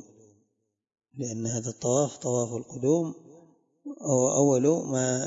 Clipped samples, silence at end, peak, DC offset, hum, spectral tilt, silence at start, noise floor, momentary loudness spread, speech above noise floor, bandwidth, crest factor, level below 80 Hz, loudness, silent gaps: under 0.1%; 0 s; -8 dBFS; under 0.1%; none; -5.5 dB/octave; 1.15 s; -78 dBFS; 17 LU; 52 dB; 8 kHz; 20 dB; -72 dBFS; -27 LUFS; none